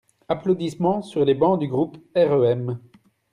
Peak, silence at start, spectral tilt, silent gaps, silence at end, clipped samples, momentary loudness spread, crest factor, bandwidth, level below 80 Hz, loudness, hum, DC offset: -6 dBFS; 0.3 s; -8 dB/octave; none; 0.55 s; under 0.1%; 9 LU; 16 dB; 10.5 kHz; -62 dBFS; -22 LUFS; none; under 0.1%